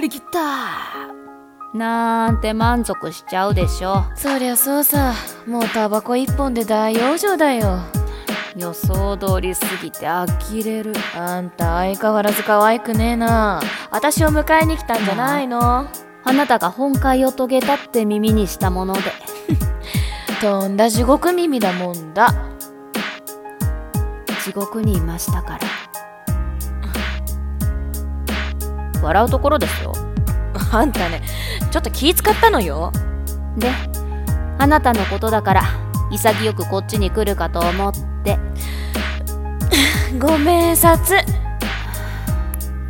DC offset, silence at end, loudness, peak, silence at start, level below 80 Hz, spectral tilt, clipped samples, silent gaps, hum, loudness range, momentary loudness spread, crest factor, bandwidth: under 0.1%; 0 s; -18 LUFS; 0 dBFS; 0 s; -26 dBFS; -5 dB/octave; under 0.1%; none; none; 6 LU; 11 LU; 18 dB; 18 kHz